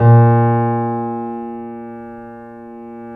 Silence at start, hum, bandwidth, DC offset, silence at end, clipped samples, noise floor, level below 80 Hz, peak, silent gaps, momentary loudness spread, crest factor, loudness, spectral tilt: 0 s; none; 2.9 kHz; under 0.1%; 0 s; under 0.1%; -34 dBFS; -54 dBFS; 0 dBFS; none; 23 LU; 16 dB; -16 LUFS; -13 dB/octave